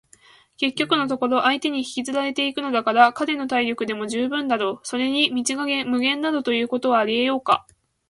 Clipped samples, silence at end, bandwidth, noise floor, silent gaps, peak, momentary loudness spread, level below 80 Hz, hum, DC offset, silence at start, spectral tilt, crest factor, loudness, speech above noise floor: under 0.1%; 0.5 s; 11.5 kHz; -53 dBFS; none; -2 dBFS; 6 LU; -66 dBFS; none; under 0.1%; 0.6 s; -2.5 dB/octave; 20 dB; -21 LUFS; 32 dB